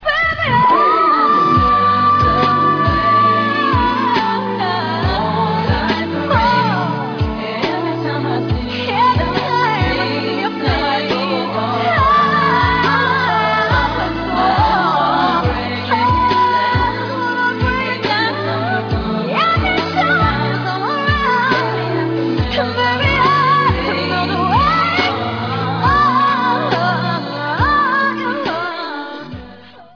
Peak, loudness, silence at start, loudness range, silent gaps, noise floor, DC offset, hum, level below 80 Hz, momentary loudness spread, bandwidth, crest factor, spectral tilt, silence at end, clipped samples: 0 dBFS; -15 LUFS; 0 s; 4 LU; none; -38 dBFS; under 0.1%; none; -32 dBFS; 7 LU; 5.4 kHz; 14 dB; -6.5 dB/octave; 0.1 s; under 0.1%